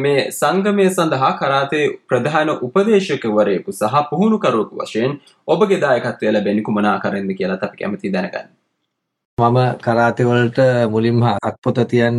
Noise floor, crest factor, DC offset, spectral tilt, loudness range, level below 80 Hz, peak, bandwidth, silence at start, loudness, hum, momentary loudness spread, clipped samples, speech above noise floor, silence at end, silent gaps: -74 dBFS; 14 dB; under 0.1%; -6.5 dB/octave; 4 LU; -56 dBFS; -2 dBFS; 14 kHz; 0 s; -17 LUFS; none; 7 LU; under 0.1%; 58 dB; 0 s; 9.25-9.37 s, 11.58-11.62 s